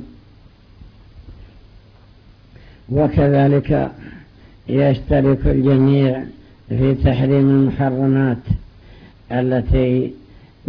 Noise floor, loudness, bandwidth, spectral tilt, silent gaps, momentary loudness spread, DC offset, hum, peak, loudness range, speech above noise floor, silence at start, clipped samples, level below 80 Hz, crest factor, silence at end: -46 dBFS; -17 LUFS; 5.2 kHz; -11.5 dB/octave; none; 12 LU; under 0.1%; none; -4 dBFS; 4 LU; 31 dB; 0 s; under 0.1%; -32 dBFS; 14 dB; 0 s